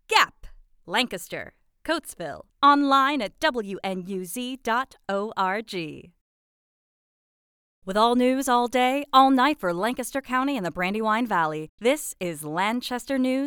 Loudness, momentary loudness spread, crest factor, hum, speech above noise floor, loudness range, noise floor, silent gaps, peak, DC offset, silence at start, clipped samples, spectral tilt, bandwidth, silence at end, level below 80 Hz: -24 LUFS; 14 LU; 20 dB; none; 22 dB; 8 LU; -46 dBFS; 6.21-7.82 s, 11.69-11.78 s; -6 dBFS; under 0.1%; 0.1 s; under 0.1%; -3.5 dB/octave; 20 kHz; 0 s; -58 dBFS